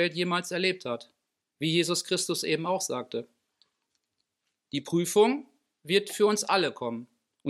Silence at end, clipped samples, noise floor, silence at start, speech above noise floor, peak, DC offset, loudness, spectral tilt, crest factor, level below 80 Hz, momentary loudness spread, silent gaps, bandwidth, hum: 0 s; under 0.1%; -81 dBFS; 0 s; 54 dB; -8 dBFS; under 0.1%; -28 LUFS; -3.5 dB/octave; 20 dB; -82 dBFS; 12 LU; none; 15 kHz; none